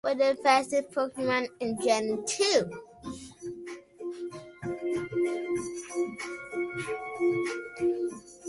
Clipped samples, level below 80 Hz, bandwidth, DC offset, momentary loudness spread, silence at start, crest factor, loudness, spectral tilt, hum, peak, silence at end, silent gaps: under 0.1%; -66 dBFS; 11.5 kHz; under 0.1%; 16 LU; 0.05 s; 20 dB; -29 LUFS; -3.5 dB/octave; none; -10 dBFS; 0 s; none